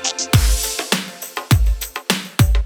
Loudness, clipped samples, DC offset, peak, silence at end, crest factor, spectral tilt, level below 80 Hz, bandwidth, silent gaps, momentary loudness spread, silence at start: -19 LUFS; under 0.1%; under 0.1%; 0 dBFS; 0 s; 16 dB; -3.5 dB/octave; -22 dBFS; over 20 kHz; none; 7 LU; 0 s